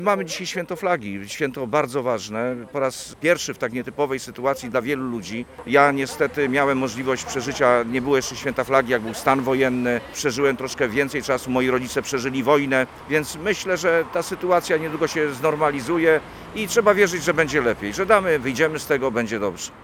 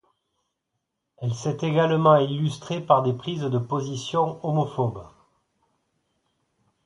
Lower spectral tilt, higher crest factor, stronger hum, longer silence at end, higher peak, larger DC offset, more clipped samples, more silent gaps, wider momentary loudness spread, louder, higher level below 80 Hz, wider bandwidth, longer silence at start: second, -4.5 dB/octave vs -7 dB/octave; about the same, 22 dB vs 22 dB; neither; second, 0 s vs 1.8 s; first, 0 dBFS vs -4 dBFS; neither; neither; neither; about the same, 8 LU vs 10 LU; about the same, -22 LUFS vs -24 LUFS; first, -52 dBFS vs -62 dBFS; first, 18 kHz vs 11 kHz; second, 0 s vs 1.2 s